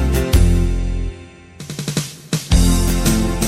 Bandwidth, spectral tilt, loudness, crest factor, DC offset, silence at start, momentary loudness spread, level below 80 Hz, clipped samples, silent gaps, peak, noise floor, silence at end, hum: 16.5 kHz; -5 dB/octave; -18 LUFS; 14 dB; under 0.1%; 0 s; 15 LU; -20 dBFS; under 0.1%; none; -2 dBFS; -37 dBFS; 0 s; none